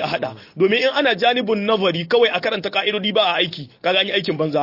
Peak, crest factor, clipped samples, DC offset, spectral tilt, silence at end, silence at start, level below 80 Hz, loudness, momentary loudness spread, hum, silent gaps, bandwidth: -4 dBFS; 14 dB; under 0.1%; under 0.1%; -5.5 dB/octave; 0 s; 0 s; -64 dBFS; -18 LUFS; 6 LU; none; none; 5.8 kHz